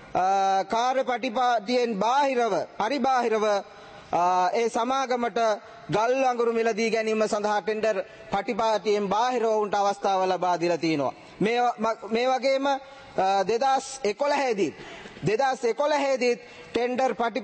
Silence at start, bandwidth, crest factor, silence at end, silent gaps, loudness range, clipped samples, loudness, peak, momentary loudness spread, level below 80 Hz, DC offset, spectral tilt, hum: 0 s; 8.8 kHz; 14 dB; 0 s; none; 1 LU; under 0.1%; -25 LUFS; -12 dBFS; 6 LU; -64 dBFS; under 0.1%; -4.5 dB/octave; none